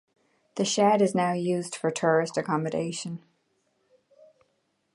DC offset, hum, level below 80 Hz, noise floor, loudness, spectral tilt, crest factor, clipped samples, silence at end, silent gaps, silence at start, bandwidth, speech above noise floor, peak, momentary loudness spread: under 0.1%; none; -74 dBFS; -73 dBFS; -26 LUFS; -5 dB/octave; 20 dB; under 0.1%; 1.8 s; none; 0.55 s; 11.5 kHz; 48 dB; -8 dBFS; 14 LU